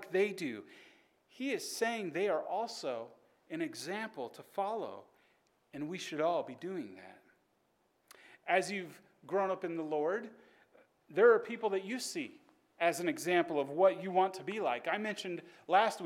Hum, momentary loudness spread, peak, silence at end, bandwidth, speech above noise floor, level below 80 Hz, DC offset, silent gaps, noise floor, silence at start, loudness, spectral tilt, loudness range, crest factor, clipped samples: none; 16 LU; -14 dBFS; 0 s; 16.5 kHz; 41 dB; -88 dBFS; under 0.1%; none; -76 dBFS; 0 s; -35 LUFS; -4 dB/octave; 8 LU; 22 dB; under 0.1%